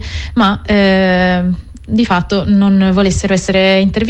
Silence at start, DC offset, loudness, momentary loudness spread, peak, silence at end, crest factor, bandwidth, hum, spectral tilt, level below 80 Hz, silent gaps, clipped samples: 0 s; under 0.1%; -12 LUFS; 7 LU; -2 dBFS; 0 s; 10 dB; 8.8 kHz; none; -6 dB/octave; -28 dBFS; none; under 0.1%